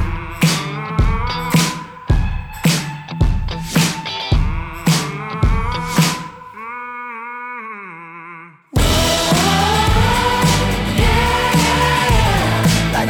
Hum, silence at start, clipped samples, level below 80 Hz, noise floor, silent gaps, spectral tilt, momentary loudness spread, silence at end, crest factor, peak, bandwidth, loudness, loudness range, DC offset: none; 0 s; under 0.1%; -24 dBFS; -37 dBFS; none; -4.5 dB/octave; 14 LU; 0 s; 14 dB; -2 dBFS; over 20 kHz; -16 LUFS; 7 LU; under 0.1%